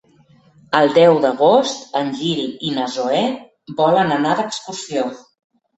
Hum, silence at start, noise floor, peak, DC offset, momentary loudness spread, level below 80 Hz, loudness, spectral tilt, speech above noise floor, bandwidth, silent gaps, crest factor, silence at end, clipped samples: none; 0.7 s; -52 dBFS; 0 dBFS; under 0.1%; 12 LU; -62 dBFS; -17 LUFS; -5 dB/octave; 35 dB; 8.2 kHz; none; 18 dB; 0.6 s; under 0.1%